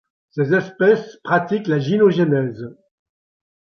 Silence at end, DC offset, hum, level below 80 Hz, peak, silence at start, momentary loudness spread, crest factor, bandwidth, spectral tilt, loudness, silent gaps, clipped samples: 0.9 s; under 0.1%; none; -64 dBFS; -2 dBFS; 0.35 s; 14 LU; 18 dB; 6.4 kHz; -8 dB/octave; -18 LUFS; none; under 0.1%